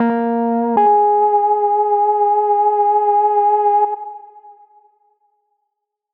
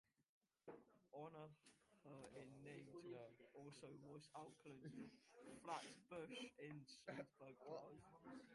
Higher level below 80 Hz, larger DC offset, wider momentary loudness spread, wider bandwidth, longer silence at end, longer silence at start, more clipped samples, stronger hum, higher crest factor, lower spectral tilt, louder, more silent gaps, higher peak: first, -84 dBFS vs -90 dBFS; neither; second, 5 LU vs 10 LU; second, 3.4 kHz vs 11.5 kHz; first, 1.65 s vs 0 s; second, 0 s vs 0.2 s; neither; neither; second, 12 dB vs 22 dB; about the same, -6 dB/octave vs -5 dB/octave; first, -15 LUFS vs -60 LUFS; second, none vs 0.29-0.41 s; first, -4 dBFS vs -38 dBFS